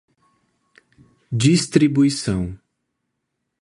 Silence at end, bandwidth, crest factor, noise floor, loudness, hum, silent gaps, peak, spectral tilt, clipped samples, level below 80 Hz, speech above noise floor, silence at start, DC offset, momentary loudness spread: 1.05 s; 11.5 kHz; 20 dB; -77 dBFS; -19 LUFS; none; none; -2 dBFS; -5.5 dB/octave; under 0.1%; -46 dBFS; 59 dB; 1.3 s; under 0.1%; 11 LU